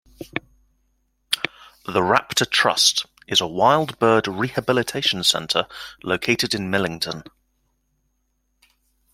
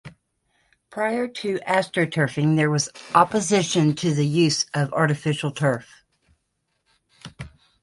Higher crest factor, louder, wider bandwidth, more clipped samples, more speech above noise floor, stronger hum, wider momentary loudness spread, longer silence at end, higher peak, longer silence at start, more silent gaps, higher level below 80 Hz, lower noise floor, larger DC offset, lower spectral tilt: about the same, 22 dB vs 22 dB; about the same, -20 LUFS vs -22 LUFS; first, 16.5 kHz vs 11.5 kHz; neither; second, 49 dB vs 53 dB; neither; first, 14 LU vs 10 LU; first, 1.9 s vs 0.35 s; about the same, 0 dBFS vs -2 dBFS; first, 0.2 s vs 0.05 s; neither; about the same, -58 dBFS vs -60 dBFS; second, -70 dBFS vs -74 dBFS; neither; second, -2.5 dB/octave vs -5 dB/octave